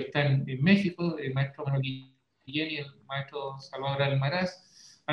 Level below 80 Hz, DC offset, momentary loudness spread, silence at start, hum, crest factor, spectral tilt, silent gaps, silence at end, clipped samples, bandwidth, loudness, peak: -66 dBFS; under 0.1%; 13 LU; 0 s; none; 22 dB; -7.5 dB/octave; none; 0 s; under 0.1%; 6.8 kHz; -30 LUFS; -8 dBFS